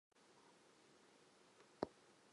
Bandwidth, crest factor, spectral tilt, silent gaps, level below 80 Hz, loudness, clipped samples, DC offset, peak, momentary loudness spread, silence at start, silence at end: 11 kHz; 34 dB; -5 dB/octave; none; -84 dBFS; -52 LUFS; under 0.1%; under 0.1%; -26 dBFS; 18 LU; 0.15 s; 0 s